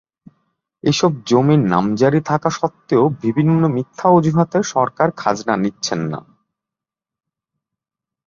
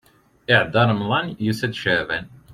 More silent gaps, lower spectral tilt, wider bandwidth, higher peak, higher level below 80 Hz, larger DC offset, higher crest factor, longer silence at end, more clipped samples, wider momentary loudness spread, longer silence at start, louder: neither; about the same, -6.5 dB/octave vs -6 dB/octave; second, 7.6 kHz vs 14.5 kHz; about the same, -2 dBFS vs 0 dBFS; about the same, -56 dBFS vs -54 dBFS; neither; about the same, 16 dB vs 20 dB; first, 2.05 s vs 0.15 s; neither; about the same, 8 LU vs 10 LU; first, 0.85 s vs 0.5 s; first, -17 LUFS vs -20 LUFS